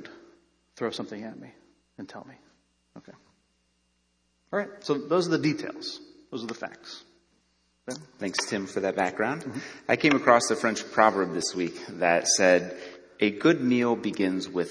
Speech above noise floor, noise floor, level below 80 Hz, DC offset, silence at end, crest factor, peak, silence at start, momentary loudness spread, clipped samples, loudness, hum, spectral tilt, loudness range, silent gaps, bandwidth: 45 dB; -71 dBFS; -72 dBFS; under 0.1%; 0 s; 24 dB; -4 dBFS; 0 s; 22 LU; under 0.1%; -26 LUFS; none; -3.5 dB/octave; 17 LU; none; 10.5 kHz